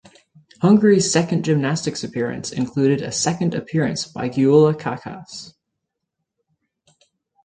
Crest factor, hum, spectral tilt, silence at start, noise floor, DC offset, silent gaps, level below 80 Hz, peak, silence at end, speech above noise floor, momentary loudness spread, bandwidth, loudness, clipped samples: 18 dB; none; -5.5 dB/octave; 0.6 s; -79 dBFS; under 0.1%; none; -58 dBFS; -2 dBFS; 1.95 s; 61 dB; 14 LU; 9.6 kHz; -19 LUFS; under 0.1%